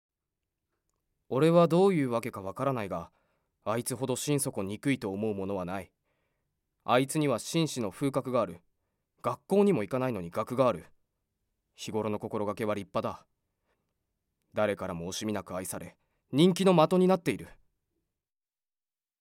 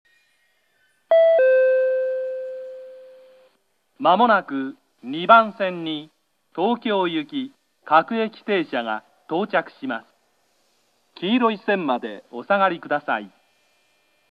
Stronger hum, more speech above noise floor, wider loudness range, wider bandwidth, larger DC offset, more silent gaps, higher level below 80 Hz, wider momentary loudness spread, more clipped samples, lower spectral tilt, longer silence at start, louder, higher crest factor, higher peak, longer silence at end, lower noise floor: neither; first, over 61 dB vs 46 dB; about the same, 7 LU vs 5 LU; first, 16.5 kHz vs 5.2 kHz; neither; neither; first, -68 dBFS vs -82 dBFS; second, 15 LU vs 18 LU; neither; about the same, -6 dB/octave vs -7 dB/octave; first, 1.3 s vs 1.1 s; second, -29 LUFS vs -21 LUFS; about the same, 22 dB vs 22 dB; second, -8 dBFS vs 0 dBFS; first, 1.7 s vs 1.05 s; first, under -90 dBFS vs -68 dBFS